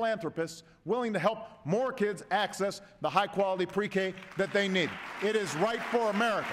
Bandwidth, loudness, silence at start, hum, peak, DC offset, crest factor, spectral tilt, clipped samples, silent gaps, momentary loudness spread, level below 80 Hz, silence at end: 15.5 kHz; -31 LUFS; 0 s; none; -12 dBFS; under 0.1%; 18 dB; -4.5 dB/octave; under 0.1%; none; 7 LU; -70 dBFS; 0 s